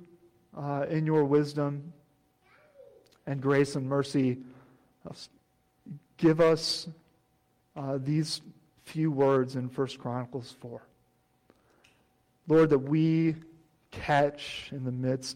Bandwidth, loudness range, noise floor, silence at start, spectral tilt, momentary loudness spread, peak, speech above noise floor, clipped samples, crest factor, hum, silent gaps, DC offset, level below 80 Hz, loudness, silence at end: 12.5 kHz; 4 LU; -70 dBFS; 0 s; -6.5 dB/octave; 23 LU; -14 dBFS; 42 dB; under 0.1%; 16 dB; none; none; under 0.1%; -64 dBFS; -28 LUFS; 0 s